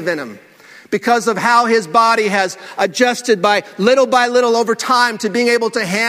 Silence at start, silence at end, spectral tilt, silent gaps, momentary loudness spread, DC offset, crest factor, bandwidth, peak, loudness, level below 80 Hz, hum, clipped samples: 0 s; 0 s; -3.5 dB/octave; none; 8 LU; under 0.1%; 14 dB; 16 kHz; 0 dBFS; -14 LUFS; -64 dBFS; none; under 0.1%